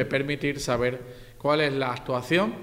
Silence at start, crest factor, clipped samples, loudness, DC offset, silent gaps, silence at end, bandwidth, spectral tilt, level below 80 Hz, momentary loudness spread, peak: 0 s; 16 dB; under 0.1%; -26 LUFS; under 0.1%; none; 0 s; 16 kHz; -5 dB/octave; -50 dBFS; 7 LU; -10 dBFS